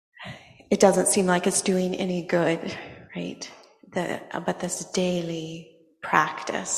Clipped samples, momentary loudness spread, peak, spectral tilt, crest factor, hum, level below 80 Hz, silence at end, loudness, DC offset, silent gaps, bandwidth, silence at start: under 0.1%; 19 LU; -2 dBFS; -4 dB/octave; 24 dB; none; -64 dBFS; 0 s; -25 LUFS; under 0.1%; none; 14 kHz; 0.2 s